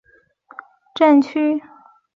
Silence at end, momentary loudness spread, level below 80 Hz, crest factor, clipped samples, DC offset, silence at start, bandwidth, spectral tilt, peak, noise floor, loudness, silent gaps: 0.55 s; 14 LU; -70 dBFS; 16 dB; under 0.1%; under 0.1%; 0.95 s; 7.2 kHz; -5.5 dB/octave; -4 dBFS; -51 dBFS; -17 LUFS; none